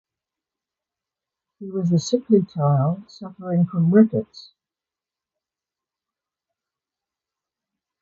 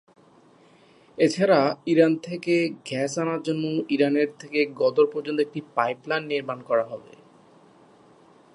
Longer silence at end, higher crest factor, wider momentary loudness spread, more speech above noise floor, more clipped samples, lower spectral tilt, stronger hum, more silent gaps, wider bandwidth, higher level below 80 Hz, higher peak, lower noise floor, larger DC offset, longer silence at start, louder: first, 3.6 s vs 1.55 s; about the same, 20 dB vs 20 dB; first, 19 LU vs 8 LU; first, 70 dB vs 32 dB; neither; first, -8 dB/octave vs -5.5 dB/octave; neither; neither; second, 7.6 kHz vs 11 kHz; first, -64 dBFS vs -76 dBFS; about the same, -4 dBFS vs -4 dBFS; first, -90 dBFS vs -55 dBFS; neither; first, 1.6 s vs 1.2 s; first, -20 LUFS vs -24 LUFS